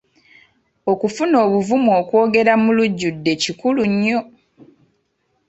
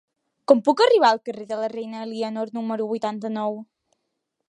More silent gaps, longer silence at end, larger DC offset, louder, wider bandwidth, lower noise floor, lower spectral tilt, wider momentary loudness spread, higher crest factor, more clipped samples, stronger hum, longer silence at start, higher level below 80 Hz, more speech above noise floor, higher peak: neither; first, 1.25 s vs 0.85 s; neither; first, -17 LUFS vs -22 LUFS; second, 8.2 kHz vs 11 kHz; second, -67 dBFS vs -78 dBFS; about the same, -5.5 dB/octave vs -5 dB/octave; second, 6 LU vs 15 LU; second, 16 dB vs 22 dB; neither; neither; first, 0.85 s vs 0.5 s; first, -60 dBFS vs -78 dBFS; second, 51 dB vs 56 dB; about the same, -2 dBFS vs -2 dBFS